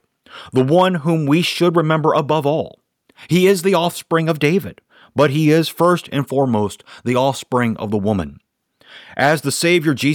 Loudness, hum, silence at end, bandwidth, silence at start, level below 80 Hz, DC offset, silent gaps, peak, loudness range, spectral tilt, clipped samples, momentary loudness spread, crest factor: -17 LUFS; none; 0 s; 18.5 kHz; 0.35 s; -54 dBFS; under 0.1%; none; -4 dBFS; 3 LU; -5.5 dB/octave; under 0.1%; 8 LU; 14 dB